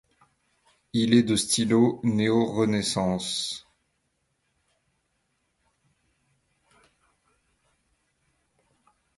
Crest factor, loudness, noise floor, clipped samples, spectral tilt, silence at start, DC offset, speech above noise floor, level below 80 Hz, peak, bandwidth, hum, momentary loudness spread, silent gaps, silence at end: 22 dB; -24 LUFS; -75 dBFS; under 0.1%; -4.5 dB/octave; 0.95 s; under 0.1%; 51 dB; -60 dBFS; -6 dBFS; 11.5 kHz; none; 9 LU; none; 5.6 s